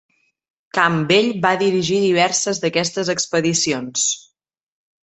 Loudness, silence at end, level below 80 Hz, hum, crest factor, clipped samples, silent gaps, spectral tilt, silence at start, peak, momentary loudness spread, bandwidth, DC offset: -18 LUFS; 0.85 s; -60 dBFS; none; 18 dB; under 0.1%; none; -3 dB/octave; 0.75 s; -2 dBFS; 5 LU; 8.4 kHz; under 0.1%